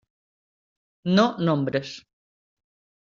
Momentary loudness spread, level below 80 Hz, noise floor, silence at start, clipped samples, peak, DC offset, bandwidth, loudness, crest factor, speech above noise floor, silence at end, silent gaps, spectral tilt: 17 LU; -66 dBFS; under -90 dBFS; 1.05 s; under 0.1%; -6 dBFS; under 0.1%; 7.4 kHz; -23 LUFS; 20 dB; over 68 dB; 1.05 s; none; -5.5 dB/octave